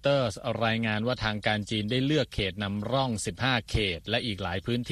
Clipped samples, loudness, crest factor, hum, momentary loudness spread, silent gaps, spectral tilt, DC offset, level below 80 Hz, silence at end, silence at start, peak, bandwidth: under 0.1%; -28 LUFS; 18 dB; none; 4 LU; none; -5 dB/octave; under 0.1%; -46 dBFS; 0 s; 0.05 s; -10 dBFS; 13.5 kHz